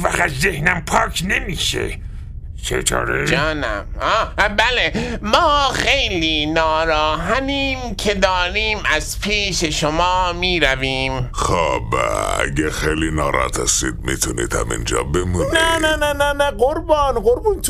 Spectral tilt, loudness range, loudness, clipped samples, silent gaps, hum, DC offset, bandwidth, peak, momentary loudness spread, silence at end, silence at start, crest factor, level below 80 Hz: -3.5 dB/octave; 3 LU; -18 LUFS; under 0.1%; none; none; under 0.1%; 15.5 kHz; 0 dBFS; 6 LU; 0 s; 0 s; 18 dB; -28 dBFS